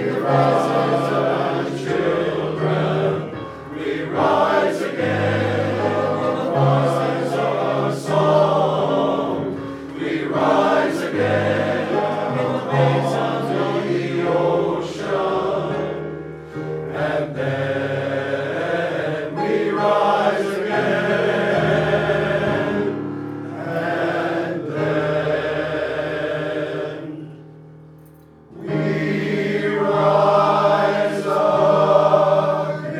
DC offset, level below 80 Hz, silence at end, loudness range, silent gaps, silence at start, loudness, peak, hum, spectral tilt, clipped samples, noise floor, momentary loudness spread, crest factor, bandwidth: under 0.1%; -54 dBFS; 0 s; 5 LU; none; 0 s; -20 LUFS; -2 dBFS; none; -7 dB/octave; under 0.1%; -45 dBFS; 10 LU; 18 dB; 13 kHz